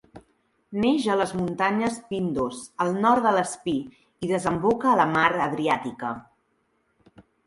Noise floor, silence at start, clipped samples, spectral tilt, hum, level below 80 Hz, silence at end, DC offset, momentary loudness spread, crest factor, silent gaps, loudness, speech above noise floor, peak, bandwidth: -70 dBFS; 0.15 s; under 0.1%; -5.5 dB/octave; none; -58 dBFS; 0.25 s; under 0.1%; 12 LU; 20 dB; none; -24 LUFS; 46 dB; -4 dBFS; 11.5 kHz